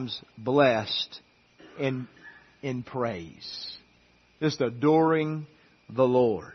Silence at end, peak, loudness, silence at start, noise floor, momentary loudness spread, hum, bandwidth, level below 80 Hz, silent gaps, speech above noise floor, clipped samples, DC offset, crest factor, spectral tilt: 0 s; -8 dBFS; -27 LUFS; 0 s; -61 dBFS; 16 LU; none; 6.4 kHz; -66 dBFS; none; 35 dB; under 0.1%; under 0.1%; 20 dB; -6.5 dB/octave